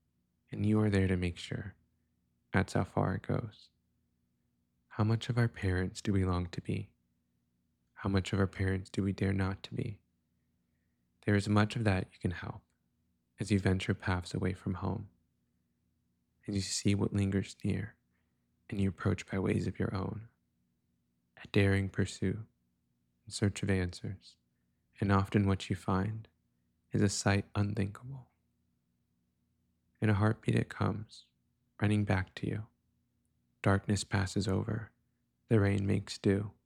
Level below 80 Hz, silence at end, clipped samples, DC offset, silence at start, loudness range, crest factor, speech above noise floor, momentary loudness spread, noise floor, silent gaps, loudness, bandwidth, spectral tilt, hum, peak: -60 dBFS; 0.15 s; under 0.1%; under 0.1%; 0.5 s; 3 LU; 22 dB; 46 dB; 13 LU; -78 dBFS; none; -33 LUFS; 11 kHz; -6.5 dB/octave; none; -12 dBFS